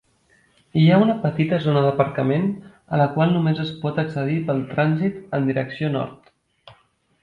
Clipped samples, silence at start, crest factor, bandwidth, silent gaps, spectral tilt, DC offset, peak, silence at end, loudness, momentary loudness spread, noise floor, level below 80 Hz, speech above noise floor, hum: under 0.1%; 0.75 s; 18 dB; 4.8 kHz; none; -9.5 dB/octave; under 0.1%; -4 dBFS; 1.05 s; -21 LUFS; 8 LU; -60 dBFS; -58 dBFS; 40 dB; none